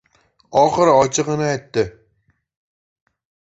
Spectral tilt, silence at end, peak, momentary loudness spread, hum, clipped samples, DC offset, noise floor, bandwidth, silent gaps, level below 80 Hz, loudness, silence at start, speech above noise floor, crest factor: -4.5 dB/octave; 1.6 s; -2 dBFS; 9 LU; none; under 0.1%; under 0.1%; -65 dBFS; 8.2 kHz; none; -52 dBFS; -17 LUFS; 0.5 s; 48 dB; 18 dB